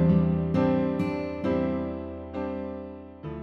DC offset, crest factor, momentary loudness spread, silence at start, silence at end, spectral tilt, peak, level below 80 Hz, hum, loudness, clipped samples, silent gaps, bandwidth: under 0.1%; 14 dB; 15 LU; 0 s; 0 s; -10 dB/octave; -12 dBFS; -46 dBFS; none; -28 LUFS; under 0.1%; none; 5.6 kHz